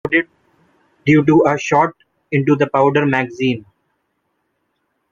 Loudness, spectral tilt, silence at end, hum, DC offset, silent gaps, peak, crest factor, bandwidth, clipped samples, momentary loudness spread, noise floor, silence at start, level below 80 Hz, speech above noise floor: -16 LUFS; -7 dB/octave; 1.5 s; none; under 0.1%; none; -2 dBFS; 16 dB; 7.4 kHz; under 0.1%; 9 LU; -69 dBFS; 0.05 s; -56 dBFS; 55 dB